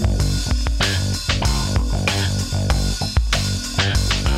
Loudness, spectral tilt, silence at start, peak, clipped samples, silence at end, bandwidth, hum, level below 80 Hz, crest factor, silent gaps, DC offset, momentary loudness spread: -20 LUFS; -4 dB/octave; 0 s; -2 dBFS; under 0.1%; 0 s; 15.5 kHz; none; -22 dBFS; 16 dB; none; under 0.1%; 2 LU